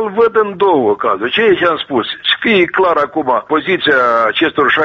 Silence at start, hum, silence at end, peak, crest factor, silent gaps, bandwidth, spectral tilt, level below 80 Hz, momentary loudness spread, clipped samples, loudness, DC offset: 0 s; none; 0 s; 0 dBFS; 12 dB; none; 6.8 kHz; -6 dB/octave; -52 dBFS; 4 LU; under 0.1%; -12 LUFS; under 0.1%